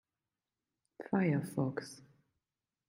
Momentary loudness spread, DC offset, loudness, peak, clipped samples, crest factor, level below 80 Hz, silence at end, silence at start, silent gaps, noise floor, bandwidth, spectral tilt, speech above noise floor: 20 LU; under 0.1%; -35 LUFS; -18 dBFS; under 0.1%; 20 dB; -78 dBFS; 0.9 s; 1 s; none; under -90 dBFS; 15.5 kHz; -7.5 dB/octave; over 55 dB